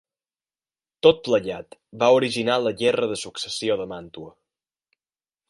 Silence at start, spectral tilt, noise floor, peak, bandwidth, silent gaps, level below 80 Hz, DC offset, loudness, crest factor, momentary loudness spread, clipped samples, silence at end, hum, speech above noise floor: 1.05 s; -4 dB/octave; under -90 dBFS; -2 dBFS; 11.5 kHz; none; -62 dBFS; under 0.1%; -22 LUFS; 22 dB; 17 LU; under 0.1%; 1.2 s; none; over 68 dB